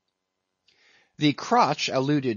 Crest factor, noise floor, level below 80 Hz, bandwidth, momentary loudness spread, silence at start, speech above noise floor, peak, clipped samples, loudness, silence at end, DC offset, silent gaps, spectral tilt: 20 dB; -81 dBFS; -72 dBFS; 7.4 kHz; 4 LU; 1.2 s; 58 dB; -6 dBFS; under 0.1%; -23 LUFS; 0 s; under 0.1%; none; -5 dB/octave